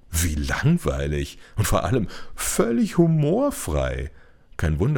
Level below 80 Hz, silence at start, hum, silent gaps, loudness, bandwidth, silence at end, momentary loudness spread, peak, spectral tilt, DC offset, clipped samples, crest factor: -34 dBFS; 0.1 s; none; none; -23 LUFS; over 20 kHz; 0 s; 11 LU; -4 dBFS; -5.5 dB/octave; under 0.1%; under 0.1%; 18 dB